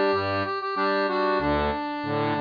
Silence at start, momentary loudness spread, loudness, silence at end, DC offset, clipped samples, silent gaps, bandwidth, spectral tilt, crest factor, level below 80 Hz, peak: 0 s; 4 LU; -25 LUFS; 0 s; under 0.1%; under 0.1%; none; 5.2 kHz; -7.5 dB/octave; 12 dB; -44 dBFS; -12 dBFS